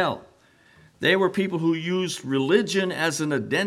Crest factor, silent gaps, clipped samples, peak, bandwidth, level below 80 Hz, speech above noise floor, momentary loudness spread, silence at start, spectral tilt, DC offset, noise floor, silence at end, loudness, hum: 18 dB; none; under 0.1%; -6 dBFS; 15 kHz; -68 dBFS; 33 dB; 5 LU; 0 s; -4.5 dB/octave; under 0.1%; -57 dBFS; 0 s; -23 LUFS; none